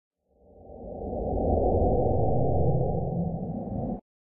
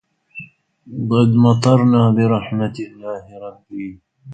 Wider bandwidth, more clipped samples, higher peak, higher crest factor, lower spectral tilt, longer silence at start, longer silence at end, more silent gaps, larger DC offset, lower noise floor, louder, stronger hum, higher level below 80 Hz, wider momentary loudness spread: second, 1.2 kHz vs 9 kHz; neither; second, -12 dBFS vs 0 dBFS; about the same, 14 dB vs 18 dB; first, -16.5 dB/octave vs -8 dB/octave; second, 0.1 s vs 0.35 s; first, 0.35 s vs 0 s; neither; neither; first, -57 dBFS vs -39 dBFS; second, -28 LUFS vs -15 LUFS; neither; first, -38 dBFS vs -52 dBFS; second, 13 LU vs 23 LU